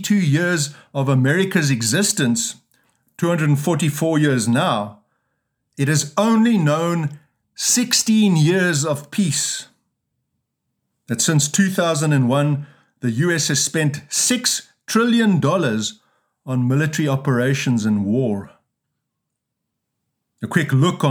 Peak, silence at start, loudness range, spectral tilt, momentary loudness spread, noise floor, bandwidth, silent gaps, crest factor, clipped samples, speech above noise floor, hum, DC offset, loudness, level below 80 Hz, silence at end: -2 dBFS; 0 s; 4 LU; -4.5 dB/octave; 9 LU; -79 dBFS; over 20 kHz; none; 16 dB; under 0.1%; 61 dB; none; under 0.1%; -18 LUFS; -70 dBFS; 0 s